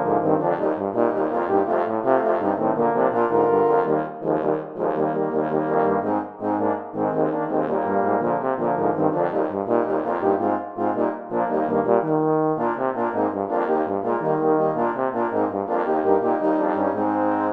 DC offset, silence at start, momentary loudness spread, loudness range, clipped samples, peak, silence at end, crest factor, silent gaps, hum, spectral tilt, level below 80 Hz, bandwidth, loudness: under 0.1%; 0 s; 4 LU; 2 LU; under 0.1%; -4 dBFS; 0 s; 18 dB; none; none; -10 dB/octave; -66 dBFS; 4.6 kHz; -22 LUFS